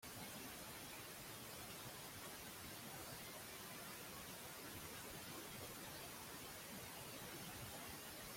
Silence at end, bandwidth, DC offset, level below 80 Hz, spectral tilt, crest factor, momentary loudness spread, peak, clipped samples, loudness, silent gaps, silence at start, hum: 0 s; 16.5 kHz; under 0.1%; -72 dBFS; -2.5 dB/octave; 14 dB; 1 LU; -40 dBFS; under 0.1%; -52 LUFS; none; 0 s; none